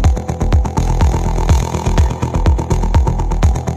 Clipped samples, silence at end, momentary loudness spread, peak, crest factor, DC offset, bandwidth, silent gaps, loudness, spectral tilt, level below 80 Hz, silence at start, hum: under 0.1%; 0 s; 2 LU; 0 dBFS; 12 dB; under 0.1%; 13.5 kHz; none; -16 LUFS; -6.5 dB/octave; -16 dBFS; 0 s; none